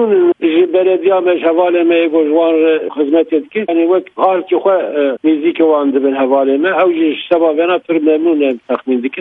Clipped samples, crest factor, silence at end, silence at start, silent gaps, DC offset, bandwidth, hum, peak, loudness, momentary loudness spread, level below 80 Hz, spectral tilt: under 0.1%; 12 dB; 0 s; 0 s; none; under 0.1%; 4 kHz; none; 0 dBFS; -12 LUFS; 4 LU; -66 dBFS; -8 dB/octave